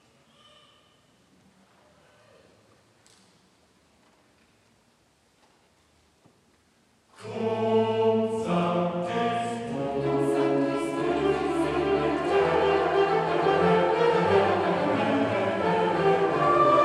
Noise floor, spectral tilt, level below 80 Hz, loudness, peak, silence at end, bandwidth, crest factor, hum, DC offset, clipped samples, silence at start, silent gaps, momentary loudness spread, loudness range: -64 dBFS; -6.5 dB/octave; -58 dBFS; -24 LUFS; -10 dBFS; 0 s; 11.5 kHz; 18 dB; none; under 0.1%; under 0.1%; 7.2 s; none; 6 LU; 6 LU